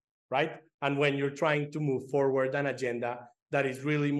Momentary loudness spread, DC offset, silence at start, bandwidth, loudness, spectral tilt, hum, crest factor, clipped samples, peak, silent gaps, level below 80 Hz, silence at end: 7 LU; under 0.1%; 0.3 s; 12.5 kHz; -30 LUFS; -6.5 dB/octave; none; 18 dB; under 0.1%; -12 dBFS; 0.74-0.78 s, 3.42-3.46 s; -82 dBFS; 0 s